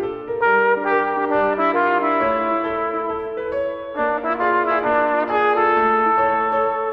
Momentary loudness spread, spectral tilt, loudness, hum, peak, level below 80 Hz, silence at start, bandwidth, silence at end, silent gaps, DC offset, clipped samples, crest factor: 8 LU; -7 dB/octave; -19 LUFS; none; -4 dBFS; -52 dBFS; 0 s; 5.8 kHz; 0 s; none; under 0.1%; under 0.1%; 14 dB